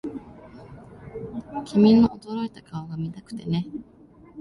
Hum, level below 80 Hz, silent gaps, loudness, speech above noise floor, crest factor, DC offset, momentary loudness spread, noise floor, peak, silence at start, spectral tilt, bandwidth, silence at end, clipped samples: none; -54 dBFS; none; -23 LUFS; 22 dB; 18 dB; under 0.1%; 28 LU; -45 dBFS; -6 dBFS; 0.05 s; -8.5 dB/octave; 11 kHz; 0 s; under 0.1%